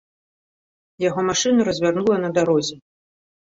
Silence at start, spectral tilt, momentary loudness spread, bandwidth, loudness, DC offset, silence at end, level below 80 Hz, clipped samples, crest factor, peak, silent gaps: 1 s; -4.5 dB/octave; 6 LU; 8 kHz; -20 LUFS; under 0.1%; 0.65 s; -58 dBFS; under 0.1%; 18 dB; -4 dBFS; none